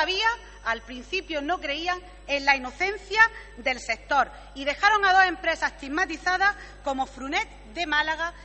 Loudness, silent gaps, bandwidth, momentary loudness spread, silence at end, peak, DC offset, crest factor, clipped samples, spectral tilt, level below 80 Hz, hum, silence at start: -25 LUFS; none; 8.4 kHz; 11 LU; 0 s; -4 dBFS; under 0.1%; 22 dB; under 0.1%; -2 dB/octave; -48 dBFS; 50 Hz at -50 dBFS; 0 s